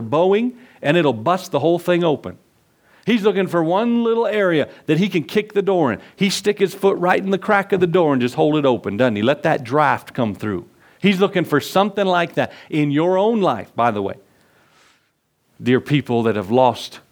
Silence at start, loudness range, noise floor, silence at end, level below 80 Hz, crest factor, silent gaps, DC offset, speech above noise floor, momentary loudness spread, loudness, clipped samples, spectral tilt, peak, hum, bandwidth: 0 s; 4 LU; -66 dBFS; 0.15 s; -64 dBFS; 18 dB; none; under 0.1%; 48 dB; 6 LU; -18 LUFS; under 0.1%; -6 dB/octave; 0 dBFS; none; over 20 kHz